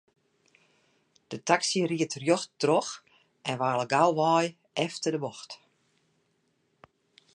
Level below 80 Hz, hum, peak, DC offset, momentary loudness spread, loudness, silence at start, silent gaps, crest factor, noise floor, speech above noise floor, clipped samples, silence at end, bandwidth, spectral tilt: -80 dBFS; none; -6 dBFS; under 0.1%; 17 LU; -28 LUFS; 1.3 s; none; 24 dB; -73 dBFS; 46 dB; under 0.1%; 1.8 s; 11.5 kHz; -4 dB/octave